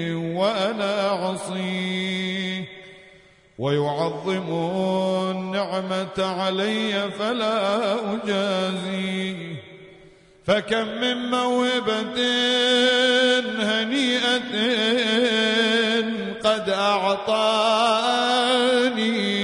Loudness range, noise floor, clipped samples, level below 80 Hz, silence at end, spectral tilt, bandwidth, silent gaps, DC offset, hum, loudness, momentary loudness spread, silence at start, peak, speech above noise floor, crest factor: 6 LU; -52 dBFS; under 0.1%; -64 dBFS; 0 s; -4 dB/octave; 11 kHz; none; under 0.1%; none; -22 LUFS; 8 LU; 0 s; -6 dBFS; 30 dB; 16 dB